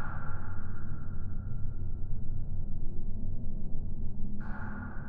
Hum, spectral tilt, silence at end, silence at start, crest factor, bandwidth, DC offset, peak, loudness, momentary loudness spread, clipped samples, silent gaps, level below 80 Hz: none; -11.5 dB/octave; 0 s; 0 s; 10 dB; 1.8 kHz; under 0.1%; -18 dBFS; -41 LUFS; 2 LU; under 0.1%; none; -34 dBFS